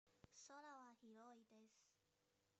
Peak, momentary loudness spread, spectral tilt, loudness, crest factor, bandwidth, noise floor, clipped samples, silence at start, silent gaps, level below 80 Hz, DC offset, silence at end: -48 dBFS; 5 LU; -2.5 dB/octave; -64 LUFS; 18 dB; 8 kHz; -86 dBFS; under 0.1%; 0.05 s; none; under -90 dBFS; under 0.1%; 0 s